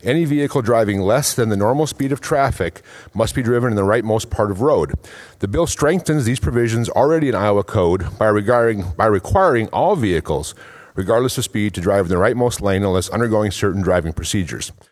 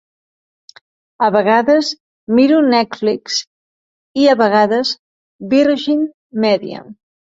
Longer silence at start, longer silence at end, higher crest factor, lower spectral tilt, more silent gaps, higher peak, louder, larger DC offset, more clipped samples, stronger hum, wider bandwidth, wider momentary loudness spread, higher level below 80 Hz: second, 0.05 s vs 1.2 s; second, 0.2 s vs 0.35 s; about the same, 18 dB vs 14 dB; about the same, -5.5 dB/octave vs -4.5 dB/octave; second, none vs 2.00-2.27 s, 3.47-4.14 s, 4.99-5.39 s, 6.14-6.30 s; about the same, 0 dBFS vs -2 dBFS; second, -18 LUFS vs -15 LUFS; neither; neither; neither; first, 14.5 kHz vs 7.8 kHz; second, 6 LU vs 13 LU; first, -38 dBFS vs -62 dBFS